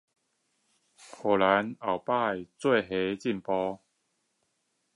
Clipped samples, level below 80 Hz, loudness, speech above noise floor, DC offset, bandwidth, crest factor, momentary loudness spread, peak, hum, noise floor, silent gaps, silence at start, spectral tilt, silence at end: under 0.1%; -68 dBFS; -28 LUFS; 49 dB; under 0.1%; 11.5 kHz; 22 dB; 9 LU; -8 dBFS; none; -77 dBFS; none; 1 s; -6 dB/octave; 1.2 s